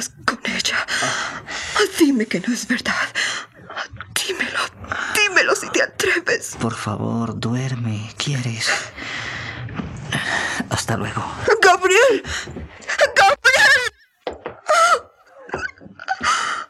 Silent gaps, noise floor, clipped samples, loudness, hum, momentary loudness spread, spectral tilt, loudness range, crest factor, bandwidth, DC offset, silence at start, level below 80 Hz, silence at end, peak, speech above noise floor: none; -44 dBFS; under 0.1%; -19 LUFS; none; 16 LU; -3 dB/octave; 8 LU; 20 dB; 15.5 kHz; under 0.1%; 0 s; -50 dBFS; 0.05 s; -2 dBFS; 23 dB